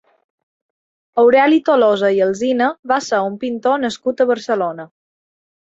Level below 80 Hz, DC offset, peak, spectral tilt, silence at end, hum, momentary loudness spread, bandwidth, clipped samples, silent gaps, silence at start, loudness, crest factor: -66 dBFS; under 0.1%; -2 dBFS; -5 dB/octave; 0.9 s; none; 9 LU; 8 kHz; under 0.1%; 2.79-2.83 s; 1.15 s; -16 LUFS; 16 dB